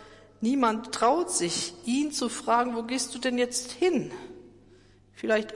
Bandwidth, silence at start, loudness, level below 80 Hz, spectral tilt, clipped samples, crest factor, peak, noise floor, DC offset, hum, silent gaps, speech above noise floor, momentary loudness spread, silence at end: 11.5 kHz; 0 s; -27 LUFS; -64 dBFS; -3 dB/octave; under 0.1%; 18 dB; -12 dBFS; -56 dBFS; under 0.1%; none; none; 29 dB; 7 LU; 0 s